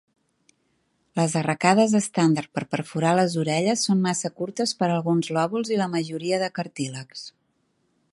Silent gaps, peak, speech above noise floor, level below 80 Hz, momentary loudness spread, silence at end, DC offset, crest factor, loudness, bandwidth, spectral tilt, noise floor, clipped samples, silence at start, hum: none; -2 dBFS; 47 dB; -70 dBFS; 11 LU; 0.85 s; under 0.1%; 22 dB; -23 LUFS; 11.5 kHz; -5 dB/octave; -70 dBFS; under 0.1%; 1.15 s; none